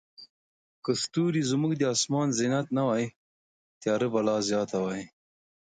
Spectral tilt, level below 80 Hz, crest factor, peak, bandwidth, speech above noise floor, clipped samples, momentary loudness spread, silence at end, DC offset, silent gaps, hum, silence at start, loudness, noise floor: -5 dB/octave; -70 dBFS; 16 dB; -12 dBFS; 9.6 kHz; over 63 dB; under 0.1%; 9 LU; 0.7 s; under 0.1%; 0.30-0.82 s, 3.16-3.81 s; none; 0.2 s; -28 LUFS; under -90 dBFS